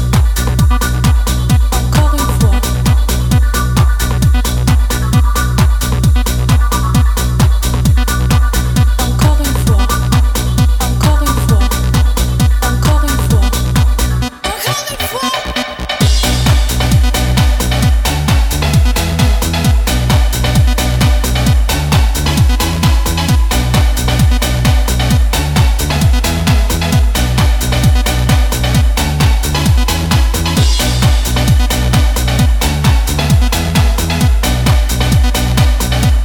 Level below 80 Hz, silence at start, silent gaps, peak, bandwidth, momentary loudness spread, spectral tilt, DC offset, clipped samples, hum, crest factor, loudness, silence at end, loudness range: -12 dBFS; 0 s; none; 0 dBFS; 18.5 kHz; 1 LU; -5 dB/octave; under 0.1%; under 0.1%; none; 10 dB; -12 LUFS; 0 s; 1 LU